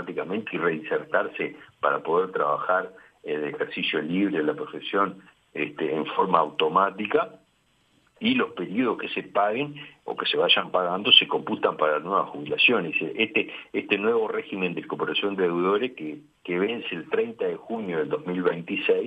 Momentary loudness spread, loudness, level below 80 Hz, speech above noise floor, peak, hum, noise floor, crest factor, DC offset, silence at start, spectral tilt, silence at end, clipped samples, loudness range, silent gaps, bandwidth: 11 LU; -25 LUFS; -74 dBFS; 40 dB; -2 dBFS; none; -66 dBFS; 24 dB; under 0.1%; 0 s; -6.5 dB/octave; 0 s; under 0.1%; 6 LU; none; 5.2 kHz